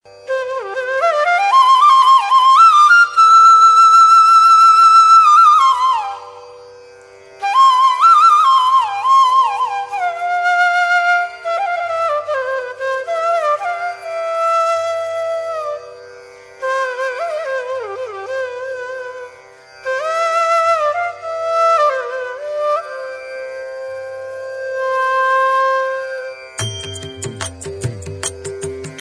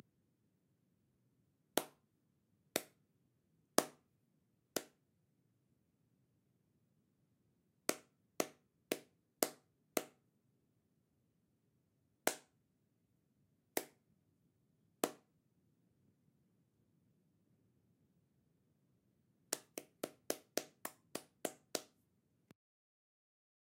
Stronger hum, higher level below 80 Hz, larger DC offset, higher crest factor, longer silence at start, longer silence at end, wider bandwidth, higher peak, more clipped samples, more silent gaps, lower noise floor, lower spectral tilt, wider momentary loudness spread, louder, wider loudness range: first, 50 Hz at -70 dBFS vs none; first, -56 dBFS vs under -90 dBFS; neither; second, 14 dB vs 40 dB; second, 0.25 s vs 1.75 s; second, 0 s vs 1.95 s; second, 12.5 kHz vs 16 kHz; first, -2 dBFS vs -10 dBFS; neither; neither; second, -41 dBFS vs -80 dBFS; about the same, -2 dB/octave vs -1.5 dB/octave; first, 20 LU vs 11 LU; first, -12 LUFS vs -44 LUFS; first, 16 LU vs 7 LU